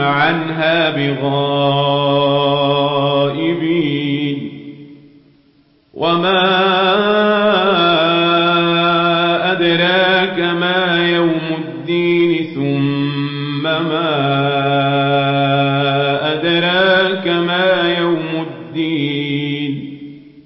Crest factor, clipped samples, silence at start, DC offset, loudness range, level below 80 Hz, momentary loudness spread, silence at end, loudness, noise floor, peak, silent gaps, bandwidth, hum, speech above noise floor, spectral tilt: 12 dB; under 0.1%; 0 s; under 0.1%; 5 LU; -60 dBFS; 8 LU; 0.05 s; -15 LUFS; -53 dBFS; -2 dBFS; none; 5.8 kHz; none; 39 dB; -11 dB/octave